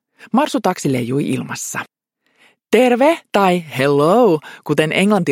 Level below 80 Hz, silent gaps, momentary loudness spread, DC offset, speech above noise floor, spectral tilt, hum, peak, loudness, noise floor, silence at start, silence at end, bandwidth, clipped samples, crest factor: -64 dBFS; none; 10 LU; under 0.1%; 46 dB; -5.5 dB/octave; none; 0 dBFS; -16 LUFS; -62 dBFS; 0.25 s; 0 s; 16.5 kHz; under 0.1%; 16 dB